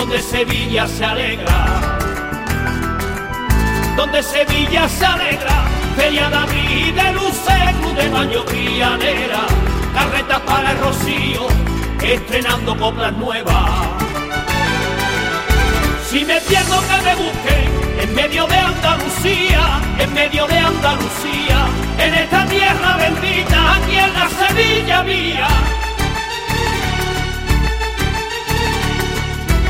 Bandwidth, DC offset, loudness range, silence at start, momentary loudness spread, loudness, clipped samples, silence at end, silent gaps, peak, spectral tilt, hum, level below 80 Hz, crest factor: 16.5 kHz; 0.3%; 4 LU; 0 s; 6 LU; -15 LUFS; under 0.1%; 0 s; none; -2 dBFS; -4 dB/octave; none; -22 dBFS; 14 dB